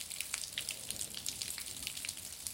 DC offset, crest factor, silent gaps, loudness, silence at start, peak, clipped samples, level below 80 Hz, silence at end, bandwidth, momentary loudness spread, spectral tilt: under 0.1%; 26 dB; none; -39 LUFS; 0 s; -16 dBFS; under 0.1%; -66 dBFS; 0 s; 17 kHz; 3 LU; 0.5 dB/octave